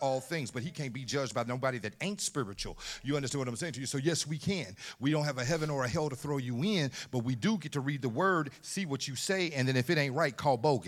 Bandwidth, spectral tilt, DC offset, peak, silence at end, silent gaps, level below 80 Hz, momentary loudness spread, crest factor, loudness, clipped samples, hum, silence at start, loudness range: 15.5 kHz; -4.5 dB/octave; under 0.1%; -14 dBFS; 0 s; none; -60 dBFS; 8 LU; 18 dB; -33 LUFS; under 0.1%; none; 0 s; 4 LU